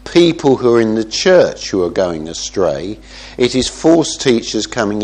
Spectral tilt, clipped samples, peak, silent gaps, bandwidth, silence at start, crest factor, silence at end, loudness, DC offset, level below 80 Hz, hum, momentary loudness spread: -4.5 dB/octave; under 0.1%; 0 dBFS; none; 9.8 kHz; 0.05 s; 14 dB; 0 s; -14 LUFS; under 0.1%; -40 dBFS; none; 10 LU